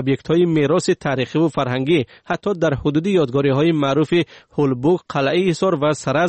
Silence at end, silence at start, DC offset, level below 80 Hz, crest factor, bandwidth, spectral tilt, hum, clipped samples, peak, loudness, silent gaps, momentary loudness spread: 0 s; 0 s; under 0.1%; -48 dBFS; 12 dB; 8.8 kHz; -6.5 dB/octave; none; under 0.1%; -6 dBFS; -18 LUFS; none; 4 LU